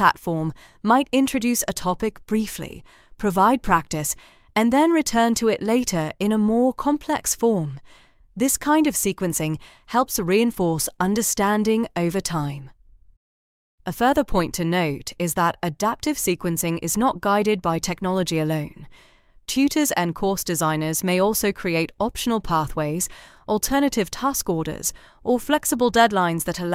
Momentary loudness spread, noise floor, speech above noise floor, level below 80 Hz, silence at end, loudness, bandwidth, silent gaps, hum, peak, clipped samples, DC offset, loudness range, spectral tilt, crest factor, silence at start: 9 LU; under -90 dBFS; over 68 dB; -44 dBFS; 0 s; -22 LUFS; 16.5 kHz; 13.17-13.78 s; none; -2 dBFS; under 0.1%; under 0.1%; 3 LU; -4.5 dB/octave; 20 dB; 0 s